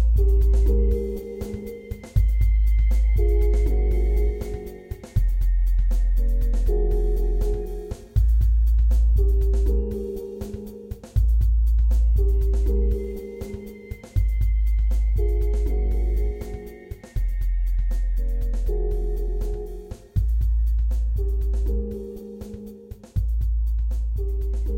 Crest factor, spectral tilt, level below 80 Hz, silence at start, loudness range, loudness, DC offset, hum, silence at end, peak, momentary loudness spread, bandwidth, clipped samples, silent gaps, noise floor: 12 dB; -8.5 dB/octave; -22 dBFS; 0 s; 5 LU; -25 LUFS; under 0.1%; none; 0 s; -8 dBFS; 14 LU; 2.3 kHz; under 0.1%; none; -40 dBFS